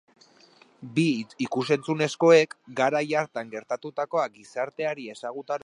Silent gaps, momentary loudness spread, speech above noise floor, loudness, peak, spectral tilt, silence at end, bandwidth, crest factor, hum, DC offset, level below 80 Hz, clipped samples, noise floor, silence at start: none; 14 LU; 31 dB; -26 LUFS; -6 dBFS; -5.5 dB/octave; 0.05 s; 11 kHz; 20 dB; none; under 0.1%; -78 dBFS; under 0.1%; -57 dBFS; 0.8 s